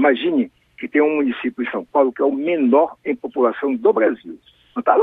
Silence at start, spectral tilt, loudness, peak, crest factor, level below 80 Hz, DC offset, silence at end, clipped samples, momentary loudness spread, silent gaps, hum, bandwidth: 0 s; -8 dB/octave; -19 LUFS; -2 dBFS; 18 dB; -64 dBFS; under 0.1%; 0 s; under 0.1%; 11 LU; none; none; 4 kHz